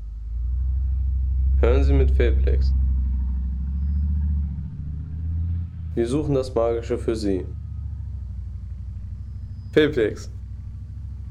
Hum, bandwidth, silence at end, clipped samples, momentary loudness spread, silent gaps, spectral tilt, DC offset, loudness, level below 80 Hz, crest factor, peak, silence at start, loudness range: none; 9.2 kHz; 0 s; under 0.1%; 16 LU; none; -8 dB/octave; under 0.1%; -24 LUFS; -24 dBFS; 16 dB; -6 dBFS; 0 s; 5 LU